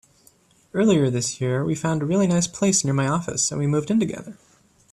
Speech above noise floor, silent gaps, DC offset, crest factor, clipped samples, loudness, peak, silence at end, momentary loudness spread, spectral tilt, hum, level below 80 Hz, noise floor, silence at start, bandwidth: 36 dB; none; under 0.1%; 14 dB; under 0.1%; -22 LUFS; -8 dBFS; 0.6 s; 6 LU; -5 dB/octave; none; -58 dBFS; -57 dBFS; 0.75 s; 13 kHz